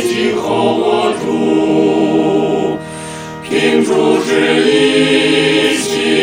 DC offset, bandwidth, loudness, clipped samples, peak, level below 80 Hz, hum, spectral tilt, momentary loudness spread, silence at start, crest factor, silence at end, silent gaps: 0.1%; over 20 kHz; -12 LUFS; under 0.1%; 0 dBFS; -52 dBFS; none; -4.5 dB/octave; 8 LU; 0 s; 12 dB; 0 s; none